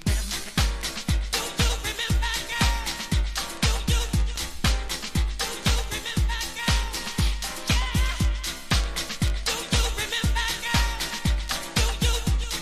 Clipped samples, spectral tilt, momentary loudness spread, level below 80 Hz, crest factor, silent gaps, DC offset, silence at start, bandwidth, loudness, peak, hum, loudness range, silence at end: under 0.1%; -3.5 dB/octave; 4 LU; -28 dBFS; 16 dB; none; under 0.1%; 0 s; 15.5 kHz; -26 LUFS; -8 dBFS; none; 1 LU; 0 s